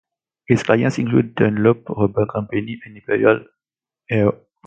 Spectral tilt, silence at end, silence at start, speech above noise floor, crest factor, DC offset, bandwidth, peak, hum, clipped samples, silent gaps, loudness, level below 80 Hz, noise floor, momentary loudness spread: -7.5 dB/octave; 0.3 s; 0.5 s; 72 dB; 18 dB; under 0.1%; 9 kHz; 0 dBFS; none; under 0.1%; none; -19 LUFS; -50 dBFS; -90 dBFS; 8 LU